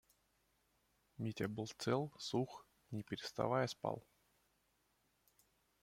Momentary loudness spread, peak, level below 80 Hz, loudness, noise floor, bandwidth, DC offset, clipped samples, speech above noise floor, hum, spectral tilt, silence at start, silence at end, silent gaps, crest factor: 11 LU; -22 dBFS; -76 dBFS; -42 LUFS; -80 dBFS; 16.5 kHz; under 0.1%; under 0.1%; 39 dB; none; -5.5 dB/octave; 1.2 s; 1.85 s; none; 22 dB